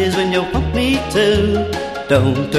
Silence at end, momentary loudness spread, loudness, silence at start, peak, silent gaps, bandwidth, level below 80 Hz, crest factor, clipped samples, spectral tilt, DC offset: 0 s; 5 LU; -16 LUFS; 0 s; -2 dBFS; none; 14 kHz; -30 dBFS; 14 dB; under 0.1%; -5.5 dB/octave; 0.2%